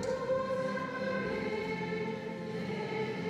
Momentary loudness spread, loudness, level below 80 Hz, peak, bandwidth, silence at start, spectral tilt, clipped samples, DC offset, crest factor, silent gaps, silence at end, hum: 5 LU; -35 LUFS; -64 dBFS; -22 dBFS; 12.5 kHz; 0 s; -6 dB/octave; under 0.1%; under 0.1%; 14 dB; none; 0 s; none